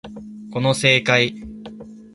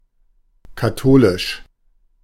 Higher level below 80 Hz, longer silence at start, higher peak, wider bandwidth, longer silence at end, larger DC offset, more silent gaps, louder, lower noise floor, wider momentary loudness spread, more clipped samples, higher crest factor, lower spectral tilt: second, -52 dBFS vs -38 dBFS; second, 0.05 s vs 0.7 s; about the same, 0 dBFS vs -2 dBFS; second, 11.5 kHz vs 16 kHz; second, 0.1 s vs 0.65 s; neither; neither; about the same, -17 LUFS vs -16 LUFS; second, -38 dBFS vs -58 dBFS; first, 22 LU vs 12 LU; neither; about the same, 22 dB vs 18 dB; second, -4 dB/octave vs -6.5 dB/octave